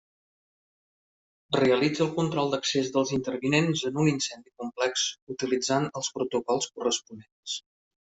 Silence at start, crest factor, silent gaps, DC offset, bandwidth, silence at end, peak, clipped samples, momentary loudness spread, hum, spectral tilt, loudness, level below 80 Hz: 1.5 s; 18 dB; 5.22-5.27 s, 7.32-7.43 s; under 0.1%; 8.2 kHz; 0.6 s; -10 dBFS; under 0.1%; 11 LU; none; -4 dB/octave; -27 LUFS; -66 dBFS